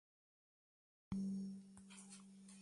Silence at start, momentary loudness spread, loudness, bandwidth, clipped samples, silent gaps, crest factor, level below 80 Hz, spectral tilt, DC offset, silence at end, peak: 1.1 s; 14 LU; -50 LUFS; 11.5 kHz; under 0.1%; none; 20 dB; -72 dBFS; -6 dB/octave; under 0.1%; 0 s; -32 dBFS